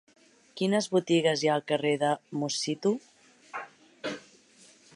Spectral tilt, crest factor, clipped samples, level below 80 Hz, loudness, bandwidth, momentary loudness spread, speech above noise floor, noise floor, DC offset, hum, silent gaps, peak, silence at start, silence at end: -4.5 dB/octave; 18 dB; under 0.1%; -80 dBFS; -28 LUFS; 11.5 kHz; 16 LU; 31 dB; -58 dBFS; under 0.1%; none; none; -12 dBFS; 0.55 s; 0.75 s